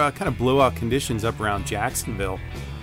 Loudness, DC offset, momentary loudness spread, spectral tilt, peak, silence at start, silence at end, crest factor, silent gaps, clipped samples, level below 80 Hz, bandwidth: -24 LUFS; under 0.1%; 9 LU; -5 dB/octave; -6 dBFS; 0 s; 0 s; 18 dB; none; under 0.1%; -38 dBFS; 16 kHz